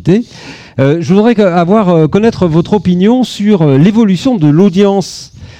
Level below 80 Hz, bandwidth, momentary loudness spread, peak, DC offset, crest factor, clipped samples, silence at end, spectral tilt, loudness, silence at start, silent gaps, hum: -40 dBFS; 9.6 kHz; 8 LU; 0 dBFS; under 0.1%; 8 dB; 0.3%; 0.1 s; -7.5 dB/octave; -9 LUFS; 0.05 s; none; none